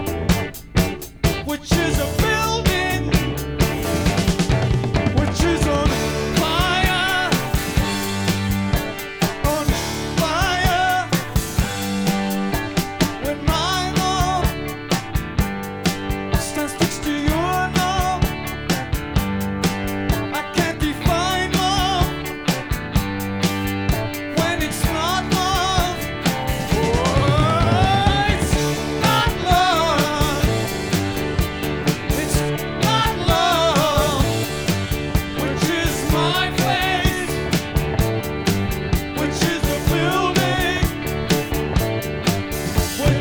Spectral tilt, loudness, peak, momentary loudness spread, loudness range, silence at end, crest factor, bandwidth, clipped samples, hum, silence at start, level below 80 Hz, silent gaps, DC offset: -4.5 dB/octave; -20 LUFS; -4 dBFS; 6 LU; 3 LU; 0 s; 16 dB; over 20 kHz; under 0.1%; none; 0 s; -28 dBFS; none; under 0.1%